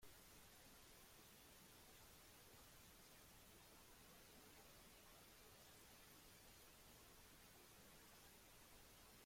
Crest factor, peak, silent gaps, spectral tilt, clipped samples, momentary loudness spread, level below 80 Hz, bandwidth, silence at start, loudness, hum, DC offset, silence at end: 14 dB; -52 dBFS; none; -2.5 dB/octave; under 0.1%; 1 LU; -76 dBFS; 16.5 kHz; 0 s; -65 LUFS; none; under 0.1%; 0 s